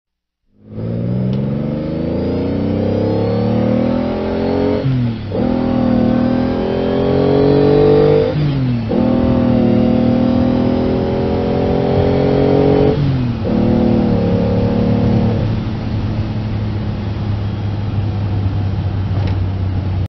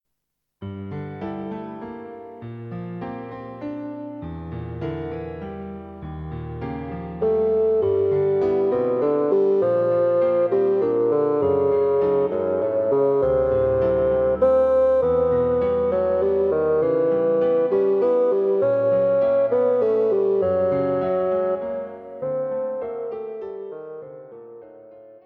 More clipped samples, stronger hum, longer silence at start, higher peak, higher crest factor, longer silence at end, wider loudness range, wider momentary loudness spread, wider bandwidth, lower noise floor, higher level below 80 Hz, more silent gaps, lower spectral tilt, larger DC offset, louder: neither; neither; about the same, 0.65 s vs 0.6 s; first, -2 dBFS vs -8 dBFS; about the same, 14 dB vs 12 dB; about the same, 0 s vs 0.1 s; second, 6 LU vs 13 LU; second, 8 LU vs 15 LU; first, 6 kHz vs 4.6 kHz; second, -64 dBFS vs -79 dBFS; first, -30 dBFS vs -48 dBFS; neither; about the same, -10 dB/octave vs -10 dB/octave; neither; first, -15 LUFS vs -21 LUFS